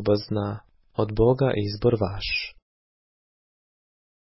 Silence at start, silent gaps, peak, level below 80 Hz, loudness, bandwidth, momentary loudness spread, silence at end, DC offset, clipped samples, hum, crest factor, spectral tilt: 0 s; none; -8 dBFS; -44 dBFS; -25 LUFS; 5.8 kHz; 13 LU; 1.75 s; under 0.1%; under 0.1%; none; 18 dB; -10.5 dB/octave